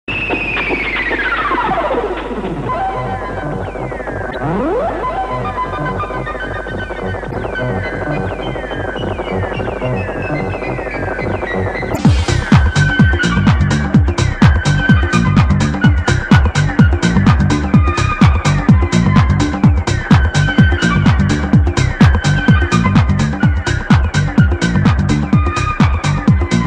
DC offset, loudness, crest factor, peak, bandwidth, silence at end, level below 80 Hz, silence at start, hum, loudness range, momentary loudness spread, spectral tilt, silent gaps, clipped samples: under 0.1%; -14 LUFS; 14 dB; 0 dBFS; 10 kHz; 0 s; -22 dBFS; 0.1 s; none; 8 LU; 10 LU; -6.5 dB/octave; none; under 0.1%